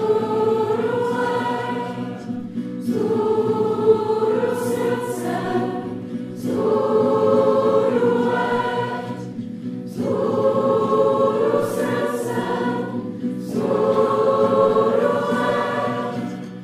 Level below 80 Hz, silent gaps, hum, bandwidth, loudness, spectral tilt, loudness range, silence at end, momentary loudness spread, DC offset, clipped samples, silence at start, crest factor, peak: -62 dBFS; none; none; 15 kHz; -21 LUFS; -6.5 dB/octave; 2 LU; 0 s; 11 LU; under 0.1%; under 0.1%; 0 s; 16 dB; -4 dBFS